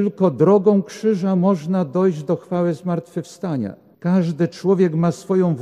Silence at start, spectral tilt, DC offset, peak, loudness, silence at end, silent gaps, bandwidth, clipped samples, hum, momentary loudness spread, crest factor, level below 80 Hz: 0 s; -8.5 dB/octave; under 0.1%; -4 dBFS; -19 LUFS; 0 s; none; 10.5 kHz; under 0.1%; none; 11 LU; 16 dB; -64 dBFS